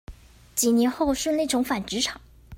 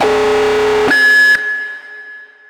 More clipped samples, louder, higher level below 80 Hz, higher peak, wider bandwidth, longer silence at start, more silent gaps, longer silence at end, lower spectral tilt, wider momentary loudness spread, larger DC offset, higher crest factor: neither; second, -24 LUFS vs -10 LUFS; about the same, -48 dBFS vs -44 dBFS; second, -8 dBFS vs -4 dBFS; about the same, 16.5 kHz vs 17 kHz; about the same, 0.1 s vs 0 s; neither; second, 0 s vs 0.25 s; about the same, -3 dB/octave vs -2.5 dB/octave; second, 7 LU vs 22 LU; neither; first, 18 dB vs 10 dB